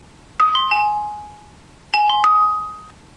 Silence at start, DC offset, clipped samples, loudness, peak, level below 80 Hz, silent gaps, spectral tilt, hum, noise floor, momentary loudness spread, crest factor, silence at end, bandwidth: 0.4 s; under 0.1%; under 0.1%; -17 LUFS; -2 dBFS; -52 dBFS; none; -1 dB/octave; none; -45 dBFS; 18 LU; 16 dB; 0.25 s; 11 kHz